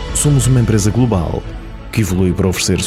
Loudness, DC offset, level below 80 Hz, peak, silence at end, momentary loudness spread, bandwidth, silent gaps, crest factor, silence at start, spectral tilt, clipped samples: -15 LUFS; under 0.1%; -26 dBFS; -2 dBFS; 0 s; 11 LU; 16 kHz; none; 12 dB; 0 s; -5.5 dB/octave; under 0.1%